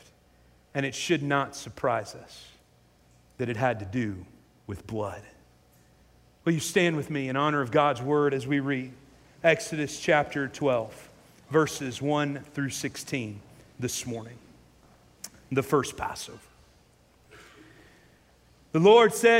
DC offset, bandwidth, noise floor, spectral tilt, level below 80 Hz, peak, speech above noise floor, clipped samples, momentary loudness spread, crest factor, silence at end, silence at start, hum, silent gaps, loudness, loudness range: under 0.1%; 16 kHz; -61 dBFS; -5 dB/octave; -62 dBFS; -8 dBFS; 35 dB; under 0.1%; 18 LU; 22 dB; 0 s; 0.75 s; none; none; -27 LUFS; 8 LU